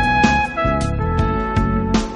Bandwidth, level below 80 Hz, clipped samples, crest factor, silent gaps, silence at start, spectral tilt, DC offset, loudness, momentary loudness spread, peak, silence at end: 10.5 kHz; -26 dBFS; under 0.1%; 16 dB; none; 0 s; -6 dB/octave; under 0.1%; -18 LUFS; 5 LU; 0 dBFS; 0 s